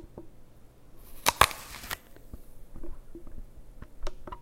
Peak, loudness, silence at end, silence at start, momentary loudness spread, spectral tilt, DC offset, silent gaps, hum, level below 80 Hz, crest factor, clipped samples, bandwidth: 0 dBFS; -28 LUFS; 0 s; 0 s; 27 LU; -1.5 dB/octave; under 0.1%; none; none; -44 dBFS; 34 dB; under 0.1%; 16.5 kHz